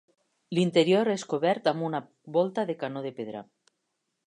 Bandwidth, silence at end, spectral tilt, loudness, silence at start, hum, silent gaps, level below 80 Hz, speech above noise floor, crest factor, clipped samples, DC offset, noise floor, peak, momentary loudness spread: 11 kHz; 0.85 s; -6 dB/octave; -27 LUFS; 0.5 s; none; none; -78 dBFS; 53 dB; 20 dB; under 0.1%; under 0.1%; -80 dBFS; -8 dBFS; 13 LU